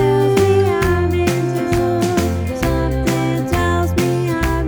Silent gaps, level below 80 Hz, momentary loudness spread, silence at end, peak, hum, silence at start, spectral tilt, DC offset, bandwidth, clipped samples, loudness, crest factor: none; -28 dBFS; 4 LU; 0 s; -2 dBFS; none; 0 s; -6.5 dB/octave; under 0.1%; over 20 kHz; under 0.1%; -17 LUFS; 14 dB